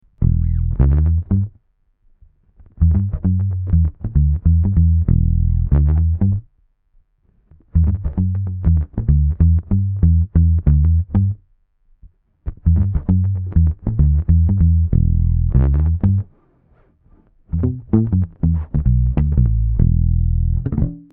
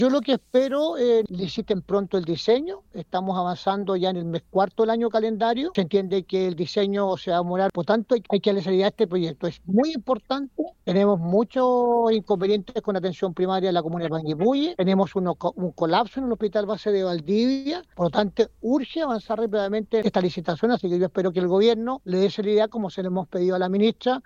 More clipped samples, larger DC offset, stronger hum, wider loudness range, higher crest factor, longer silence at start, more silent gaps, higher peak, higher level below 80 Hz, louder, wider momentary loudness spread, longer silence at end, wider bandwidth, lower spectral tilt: neither; neither; neither; about the same, 4 LU vs 2 LU; about the same, 16 dB vs 16 dB; first, 0.2 s vs 0 s; neither; first, 0 dBFS vs -6 dBFS; first, -20 dBFS vs -58 dBFS; first, -18 LUFS vs -24 LUFS; about the same, 6 LU vs 6 LU; about the same, 0.15 s vs 0.05 s; second, 2.1 kHz vs 7.4 kHz; first, -14 dB/octave vs -7 dB/octave